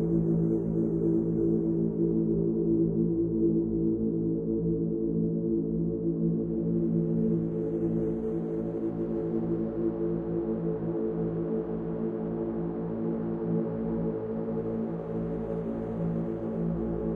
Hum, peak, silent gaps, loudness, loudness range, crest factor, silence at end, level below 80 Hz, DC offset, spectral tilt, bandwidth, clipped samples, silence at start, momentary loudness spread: none; -16 dBFS; none; -29 LUFS; 5 LU; 14 dB; 0 s; -48 dBFS; under 0.1%; -13 dB/octave; 2.8 kHz; under 0.1%; 0 s; 6 LU